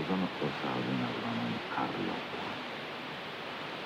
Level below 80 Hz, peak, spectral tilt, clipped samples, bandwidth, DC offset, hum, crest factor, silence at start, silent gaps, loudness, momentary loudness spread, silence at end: -72 dBFS; -20 dBFS; -6 dB/octave; under 0.1%; 15.5 kHz; under 0.1%; none; 16 dB; 0 s; none; -36 LUFS; 6 LU; 0 s